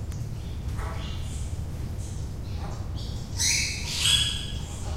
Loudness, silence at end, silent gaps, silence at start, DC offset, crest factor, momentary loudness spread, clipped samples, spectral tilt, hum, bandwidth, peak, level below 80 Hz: -28 LUFS; 0 s; none; 0 s; under 0.1%; 20 dB; 13 LU; under 0.1%; -2 dB/octave; none; 16 kHz; -10 dBFS; -36 dBFS